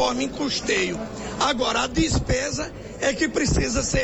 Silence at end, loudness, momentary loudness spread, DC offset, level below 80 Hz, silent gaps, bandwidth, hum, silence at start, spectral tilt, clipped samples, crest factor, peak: 0 s; -23 LUFS; 7 LU; under 0.1%; -34 dBFS; none; 8.6 kHz; none; 0 s; -3.5 dB/octave; under 0.1%; 14 dB; -10 dBFS